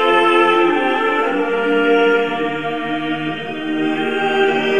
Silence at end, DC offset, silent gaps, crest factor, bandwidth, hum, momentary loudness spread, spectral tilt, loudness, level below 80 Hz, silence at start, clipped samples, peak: 0 s; 1%; none; 14 dB; 9.8 kHz; none; 9 LU; -5.5 dB/octave; -16 LUFS; -54 dBFS; 0 s; under 0.1%; -2 dBFS